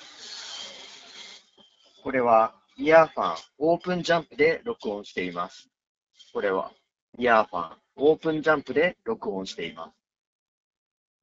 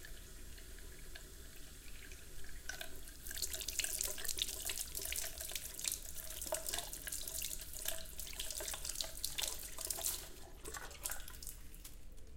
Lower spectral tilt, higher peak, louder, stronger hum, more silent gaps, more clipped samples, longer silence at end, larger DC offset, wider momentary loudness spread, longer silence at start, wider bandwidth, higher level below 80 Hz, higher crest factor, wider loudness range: first, -3 dB/octave vs -0.5 dB/octave; first, -4 dBFS vs -16 dBFS; first, -25 LUFS vs -42 LUFS; neither; first, 5.87-6.07 s, 7.02-7.13 s vs none; neither; first, 1.35 s vs 0 s; neither; first, 19 LU vs 15 LU; about the same, 0.05 s vs 0 s; second, 7.8 kHz vs 17 kHz; second, -64 dBFS vs -54 dBFS; second, 22 dB vs 28 dB; about the same, 5 LU vs 5 LU